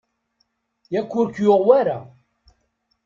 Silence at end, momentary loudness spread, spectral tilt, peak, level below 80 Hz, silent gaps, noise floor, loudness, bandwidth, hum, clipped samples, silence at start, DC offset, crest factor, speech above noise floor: 1 s; 12 LU; -8 dB/octave; -2 dBFS; -64 dBFS; none; -70 dBFS; -19 LUFS; 7.4 kHz; none; under 0.1%; 0.9 s; under 0.1%; 20 dB; 52 dB